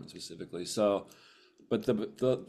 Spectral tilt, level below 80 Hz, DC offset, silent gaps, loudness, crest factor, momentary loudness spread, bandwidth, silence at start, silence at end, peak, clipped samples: -5.5 dB/octave; -68 dBFS; under 0.1%; none; -33 LUFS; 18 dB; 14 LU; 14.5 kHz; 0 s; 0.05 s; -16 dBFS; under 0.1%